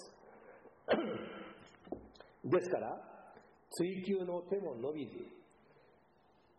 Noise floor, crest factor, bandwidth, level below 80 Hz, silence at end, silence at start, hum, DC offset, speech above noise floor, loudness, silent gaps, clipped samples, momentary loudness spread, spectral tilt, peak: -69 dBFS; 20 dB; 6.8 kHz; -76 dBFS; 1.15 s; 0 s; none; under 0.1%; 32 dB; -39 LUFS; none; under 0.1%; 23 LU; -5 dB/octave; -22 dBFS